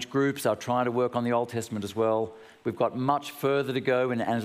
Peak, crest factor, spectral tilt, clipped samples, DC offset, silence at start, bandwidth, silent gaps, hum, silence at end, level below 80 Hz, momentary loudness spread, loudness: -10 dBFS; 18 dB; -6 dB/octave; under 0.1%; under 0.1%; 0 s; 15.5 kHz; none; none; 0 s; -72 dBFS; 7 LU; -28 LUFS